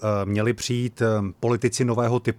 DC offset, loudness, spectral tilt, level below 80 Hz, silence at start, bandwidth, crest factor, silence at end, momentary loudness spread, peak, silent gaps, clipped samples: under 0.1%; -23 LUFS; -6 dB/octave; -56 dBFS; 0 s; 14 kHz; 14 dB; 0.05 s; 3 LU; -8 dBFS; none; under 0.1%